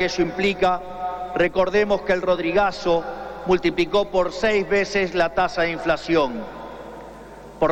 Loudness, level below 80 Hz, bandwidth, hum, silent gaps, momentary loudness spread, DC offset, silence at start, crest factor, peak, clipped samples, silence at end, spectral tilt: -21 LUFS; -44 dBFS; 9.4 kHz; none; none; 16 LU; under 0.1%; 0 s; 14 dB; -8 dBFS; under 0.1%; 0 s; -5 dB/octave